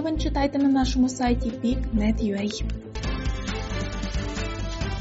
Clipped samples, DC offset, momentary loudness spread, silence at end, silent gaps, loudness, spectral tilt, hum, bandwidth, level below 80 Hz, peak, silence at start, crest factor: under 0.1%; under 0.1%; 9 LU; 0 s; none; -26 LUFS; -5.5 dB/octave; none; 8 kHz; -30 dBFS; -12 dBFS; 0 s; 14 dB